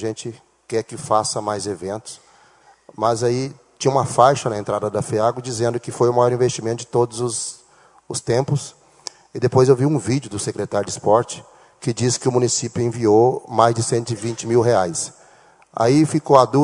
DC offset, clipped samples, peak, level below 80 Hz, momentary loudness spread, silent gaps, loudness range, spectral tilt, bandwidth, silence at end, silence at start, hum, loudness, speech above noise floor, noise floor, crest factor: under 0.1%; under 0.1%; 0 dBFS; -58 dBFS; 14 LU; none; 5 LU; -5.5 dB/octave; 11 kHz; 0 s; 0 s; none; -19 LUFS; 34 dB; -52 dBFS; 20 dB